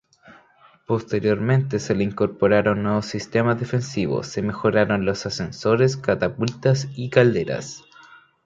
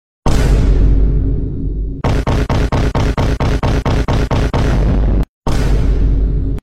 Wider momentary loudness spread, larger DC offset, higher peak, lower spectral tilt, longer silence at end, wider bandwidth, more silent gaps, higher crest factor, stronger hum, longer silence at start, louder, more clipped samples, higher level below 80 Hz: first, 8 LU vs 5 LU; second, under 0.1% vs 1%; about the same, -2 dBFS vs -2 dBFS; about the same, -6.5 dB/octave vs -7 dB/octave; first, 0.3 s vs 0.05 s; second, 7.8 kHz vs 9.8 kHz; second, none vs 5.29-5.42 s; first, 20 dB vs 12 dB; neither; about the same, 0.3 s vs 0.25 s; second, -22 LUFS vs -16 LUFS; neither; second, -52 dBFS vs -14 dBFS